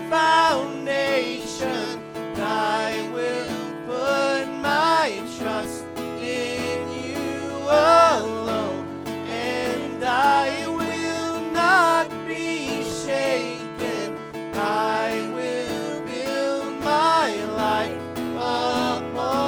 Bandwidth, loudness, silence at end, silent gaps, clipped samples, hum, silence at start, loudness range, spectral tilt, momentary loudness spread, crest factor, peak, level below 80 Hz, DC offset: over 20 kHz; -23 LUFS; 0 s; none; under 0.1%; none; 0 s; 4 LU; -4 dB/octave; 11 LU; 18 dB; -4 dBFS; -58 dBFS; under 0.1%